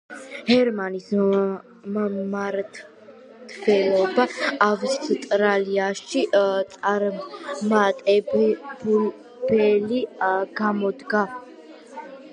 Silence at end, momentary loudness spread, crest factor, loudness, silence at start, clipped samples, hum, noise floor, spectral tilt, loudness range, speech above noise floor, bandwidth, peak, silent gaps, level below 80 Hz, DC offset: 0 s; 13 LU; 20 dB; -22 LUFS; 0.1 s; under 0.1%; none; -46 dBFS; -5.5 dB/octave; 3 LU; 24 dB; 10.5 kHz; -4 dBFS; none; -68 dBFS; under 0.1%